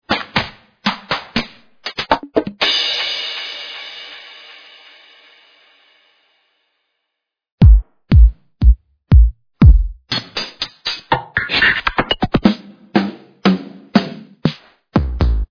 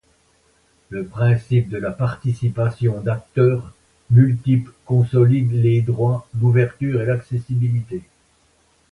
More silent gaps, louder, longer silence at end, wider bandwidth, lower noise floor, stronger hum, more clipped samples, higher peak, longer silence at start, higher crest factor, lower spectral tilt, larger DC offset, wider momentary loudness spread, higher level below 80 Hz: first, 7.52-7.58 s vs none; about the same, -17 LUFS vs -19 LUFS; second, 0.05 s vs 0.9 s; first, 5.4 kHz vs 4.4 kHz; first, -78 dBFS vs -59 dBFS; neither; first, 0.1% vs under 0.1%; about the same, 0 dBFS vs -2 dBFS; second, 0.1 s vs 0.9 s; about the same, 16 dB vs 16 dB; second, -6.5 dB/octave vs -9.5 dB/octave; neither; first, 16 LU vs 9 LU; first, -18 dBFS vs -50 dBFS